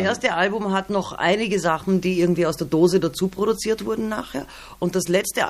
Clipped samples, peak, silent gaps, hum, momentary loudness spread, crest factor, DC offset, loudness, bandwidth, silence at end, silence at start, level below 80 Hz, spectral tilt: under 0.1%; -6 dBFS; none; none; 8 LU; 16 dB; under 0.1%; -22 LUFS; 15 kHz; 0 s; 0 s; -50 dBFS; -5 dB/octave